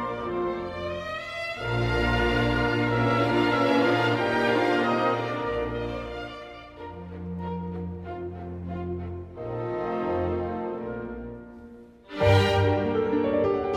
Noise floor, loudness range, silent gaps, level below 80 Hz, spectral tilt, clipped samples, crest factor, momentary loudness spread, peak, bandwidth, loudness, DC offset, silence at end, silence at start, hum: -47 dBFS; 11 LU; none; -42 dBFS; -7 dB/octave; under 0.1%; 18 dB; 16 LU; -8 dBFS; 14 kHz; -26 LUFS; under 0.1%; 0 s; 0 s; none